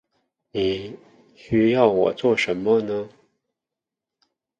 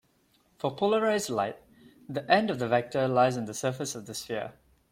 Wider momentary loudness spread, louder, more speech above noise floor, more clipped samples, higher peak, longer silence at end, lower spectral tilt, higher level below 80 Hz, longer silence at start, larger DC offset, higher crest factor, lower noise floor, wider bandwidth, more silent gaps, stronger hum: about the same, 14 LU vs 12 LU; first, -21 LUFS vs -28 LUFS; first, 66 dB vs 40 dB; neither; first, -4 dBFS vs -8 dBFS; first, 1.5 s vs 0.4 s; first, -6.5 dB/octave vs -4.5 dB/octave; first, -56 dBFS vs -68 dBFS; about the same, 0.55 s vs 0.65 s; neither; about the same, 20 dB vs 20 dB; first, -87 dBFS vs -68 dBFS; second, 9.2 kHz vs 16.5 kHz; neither; neither